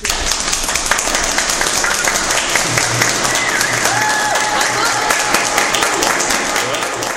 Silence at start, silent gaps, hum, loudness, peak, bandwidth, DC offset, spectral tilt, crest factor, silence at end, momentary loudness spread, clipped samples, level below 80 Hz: 0 s; none; none; -14 LUFS; 0 dBFS; 16.5 kHz; under 0.1%; -1 dB/octave; 16 dB; 0 s; 2 LU; under 0.1%; -34 dBFS